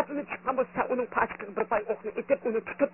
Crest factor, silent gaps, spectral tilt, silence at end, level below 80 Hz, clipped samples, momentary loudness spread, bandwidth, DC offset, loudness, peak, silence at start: 20 dB; none; -10 dB/octave; 0.05 s; -62 dBFS; under 0.1%; 5 LU; 3.1 kHz; under 0.1%; -30 LUFS; -10 dBFS; 0 s